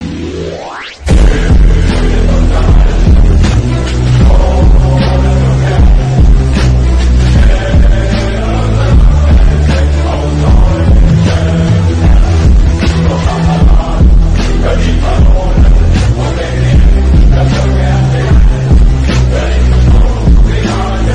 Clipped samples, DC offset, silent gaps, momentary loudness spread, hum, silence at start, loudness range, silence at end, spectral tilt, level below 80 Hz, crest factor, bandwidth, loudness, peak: under 0.1%; under 0.1%; none; 4 LU; none; 0 s; 1 LU; 0 s; -7 dB/octave; -8 dBFS; 6 dB; 9.2 kHz; -9 LUFS; 0 dBFS